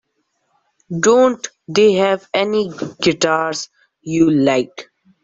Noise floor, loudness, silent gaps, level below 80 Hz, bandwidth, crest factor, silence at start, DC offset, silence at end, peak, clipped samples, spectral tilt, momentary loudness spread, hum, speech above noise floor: -68 dBFS; -16 LUFS; none; -56 dBFS; 8 kHz; 16 dB; 0.9 s; under 0.1%; 0.4 s; 0 dBFS; under 0.1%; -4.5 dB/octave; 15 LU; none; 53 dB